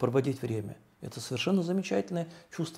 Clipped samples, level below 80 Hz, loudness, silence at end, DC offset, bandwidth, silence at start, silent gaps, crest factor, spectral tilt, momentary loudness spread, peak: under 0.1%; -72 dBFS; -32 LUFS; 0 s; under 0.1%; 15.5 kHz; 0 s; none; 20 dB; -6 dB/octave; 14 LU; -12 dBFS